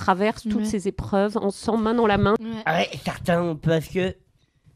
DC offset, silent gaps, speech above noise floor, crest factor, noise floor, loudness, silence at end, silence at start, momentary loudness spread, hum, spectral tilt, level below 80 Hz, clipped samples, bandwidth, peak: under 0.1%; none; 37 dB; 18 dB; -60 dBFS; -23 LUFS; 0.6 s; 0 s; 7 LU; none; -6 dB/octave; -46 dBFS; under 0.1%; 14.5 kHz; -6 dBFS